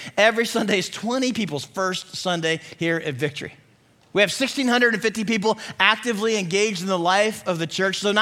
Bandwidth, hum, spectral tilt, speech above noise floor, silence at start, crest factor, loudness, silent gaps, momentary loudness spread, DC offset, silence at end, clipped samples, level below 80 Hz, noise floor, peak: 16.5 kHz; none; -3.5 dB/octave; 35 dB; 0 s; 22 dB; -22 LUFS; none; 8 LU; under 0.1%; 0 s; under 0.1%; -64 dBFS; -57 dBFS; 0 dBFS